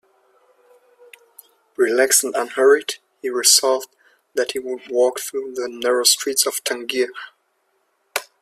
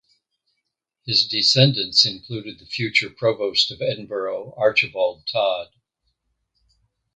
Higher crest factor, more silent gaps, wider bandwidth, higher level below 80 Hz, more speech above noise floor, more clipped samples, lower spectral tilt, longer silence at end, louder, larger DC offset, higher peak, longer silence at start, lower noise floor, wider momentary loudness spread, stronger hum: about the same, 22 dB vs 22 dB; neither; first, 16 kHz vs 9.4 kHz; second, -72 dBFS vs -62 dBFS; second, 48 dB vs 57 dB; neither; second, 1 dB/octave vs -4 dB/octave; second, 0.2 s vs 1.5 s; about the same, -19 LUFS vs -19 LUFS; neither; about the same, 0 dBFS vs -2 dBFS; first, 1.8 s vs 1.05 s; second, -67 dBFS vs -78 dBFS; about the same, 14 LU vs 14 LU; neither